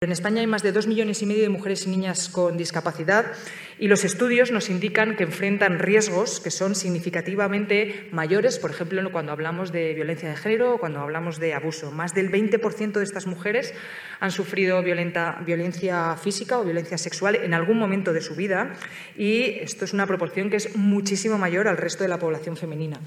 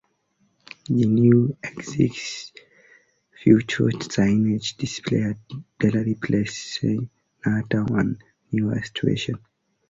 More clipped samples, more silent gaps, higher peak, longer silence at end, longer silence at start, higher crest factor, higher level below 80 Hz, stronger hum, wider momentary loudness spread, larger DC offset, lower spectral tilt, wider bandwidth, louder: neither; neither; about the same, -4 dBFS vs -4 dBFS; second, 0 s vs 0.5 s; second, 0 s vs 0.9 s; about the same, 20 dB vs 20 dB; second, -74 dBFS vs -52 dBFS; neither; second, 8 LU vs 15 LU; neither; second, -4.5 dB/octave vs -6.5 dB/octave; first, 14.5 kHz vs 7.8 kHz; about the same, -24 LUFS vs -23 LUFS